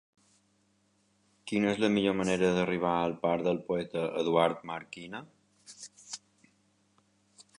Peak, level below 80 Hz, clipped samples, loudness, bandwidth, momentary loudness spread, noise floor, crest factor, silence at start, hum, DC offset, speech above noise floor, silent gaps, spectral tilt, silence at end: -10 dBFS; -66 dBFS; under 0.1%; -30 LUFS; 11 kHz; 17 LU; -71 dBFS; 22 dB; 1.45 s; none; under 0.1%; 41 dB; none; -5.5 dB/octave; 1.4 s